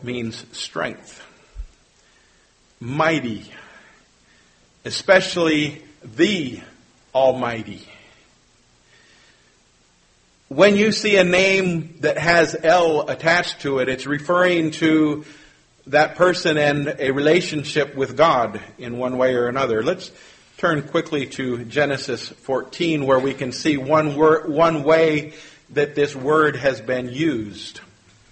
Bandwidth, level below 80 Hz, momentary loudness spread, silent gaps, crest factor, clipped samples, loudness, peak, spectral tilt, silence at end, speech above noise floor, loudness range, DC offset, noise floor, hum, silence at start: 8.8 kHz; -52 dBFS; 14 LU; none; 20 dB; under 0.1%; -19 LUFS; -2 dBFS; -5 dB/octave; 0.5 s; 39 dB; 9 LU; under 0.1%; -58 dBFS; none; 0 s